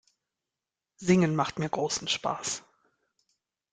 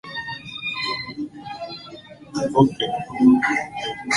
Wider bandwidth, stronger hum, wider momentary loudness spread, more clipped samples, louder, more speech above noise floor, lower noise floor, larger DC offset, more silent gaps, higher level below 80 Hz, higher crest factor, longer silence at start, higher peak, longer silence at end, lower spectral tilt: second, 9.6 kHz vs 11.5 kHz; neither; second, 10 LU vs 18 LU; neither; second, -28 LUFS vs -22 LUFS; first, 62 dB vs 22 dB; first, -89 dBFS vs -41 dBFS; neither; neither; second, -66 dBFS vs -56 dBFS; about the same, 22 dB vs 20 dB; first, 1 s vs 0.05 s; second, -10 dBFS vs -2 dBFS; first, 1.15 s vs 0 s; about the same, -4.5 dB/octave vs -5 dB/octave